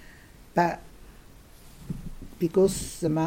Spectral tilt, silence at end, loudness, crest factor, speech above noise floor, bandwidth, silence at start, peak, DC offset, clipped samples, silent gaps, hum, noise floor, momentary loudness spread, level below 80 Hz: -6 dB/octave; 0 s; -27 LUFS; 20 dB; 25 dB; 16.5 kHz; 0 s; -10 dBFS; under 0.1%; under 0.1%; none; none; -50 dBFS; 17 LU; -46 dBFS